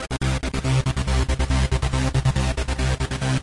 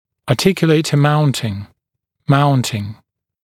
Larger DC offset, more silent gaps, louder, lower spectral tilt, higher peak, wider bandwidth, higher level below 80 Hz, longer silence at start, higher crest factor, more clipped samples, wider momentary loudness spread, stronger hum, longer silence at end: neither; neither; second, -23 LUFS vs -16 LUFS; about the same, -5.5 dB/octave vs -6 dB/octave; second, -8 dBFS vs 0 dBFS; second, 11.5 kHz vs 15.5 kHz; first, -26 dBFS vs -52 dBFS; second, 0 s vs 0.25 s; about the same, 14 dB vs 16 dB; neither; second, 3 LU vs 14 LU; neither; second, 0 s vs 0.5 s